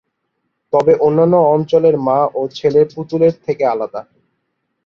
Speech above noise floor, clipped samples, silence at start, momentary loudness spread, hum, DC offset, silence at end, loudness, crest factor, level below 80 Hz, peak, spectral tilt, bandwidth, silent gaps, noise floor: 57 dB; under 0.1%; 0.75 s; 7 LU; none; under 0.1%; 0.85 s; -14 LUFS; 14 dB; -56 dBFS; -2 dBFS; -8.5 dB/octave; 6.8 kHz; none; -71 dBFS